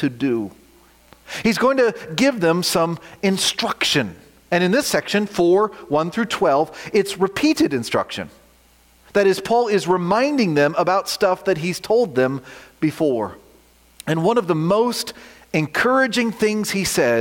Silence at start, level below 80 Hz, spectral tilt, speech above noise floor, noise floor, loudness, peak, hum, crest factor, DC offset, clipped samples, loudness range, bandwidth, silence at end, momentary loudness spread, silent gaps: 0 s; -56 dBFS; -4.5 dB/octave; 35 dB; -54 dBFS; -19 LUFS; -4 dBFS; none; 16 dB; under 0.1%; under 0.1%; 3 LU; 17 kHz; 0 s; 7 LU; none